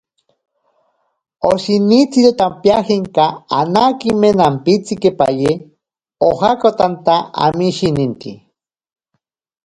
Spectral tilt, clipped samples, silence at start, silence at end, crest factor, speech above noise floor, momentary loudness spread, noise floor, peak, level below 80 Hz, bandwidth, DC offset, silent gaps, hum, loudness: -6.5 dB/octave; under 0.1%; 1.4 s; 1.3 s; 14 dB; 59 dB; 7 LU; -72 dBFS; 0 dBFS; -50 dBFS; 11 kHz; under 0.1%; none; none; -14 LUFS